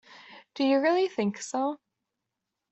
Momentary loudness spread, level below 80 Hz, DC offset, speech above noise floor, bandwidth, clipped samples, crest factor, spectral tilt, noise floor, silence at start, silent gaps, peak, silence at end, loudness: 15 LU; -78 dBFS; under 0.1%; 59 dB; 8.2 kHz; under 0.1%; 16 dB; -4.5 dB/octave; -85 dBFS; 0.1 s; none; -14 dBFS; 0.95 s; -27 LUFS